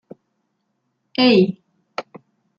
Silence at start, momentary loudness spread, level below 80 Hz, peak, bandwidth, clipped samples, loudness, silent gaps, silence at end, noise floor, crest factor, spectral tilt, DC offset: 1.2 s; 19 LU; -68 dBFS; -2 dBFS; 7 kHz; under 0.1%; -17 LUFS; none; 0.6 s; -72 dBFS; 18 dB; -7 dB/octave; under 0.1%